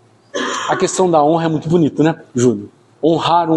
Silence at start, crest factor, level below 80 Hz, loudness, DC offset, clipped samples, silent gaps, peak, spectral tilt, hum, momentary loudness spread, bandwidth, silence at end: 0.35 s; 14 dB; -56 dBFS; -16 LUFS; under 0.1%; under 0.1%; none; -2 dBFS; -5.5 dB/octave; none; 8 LU; 11.5 kHz; 0 s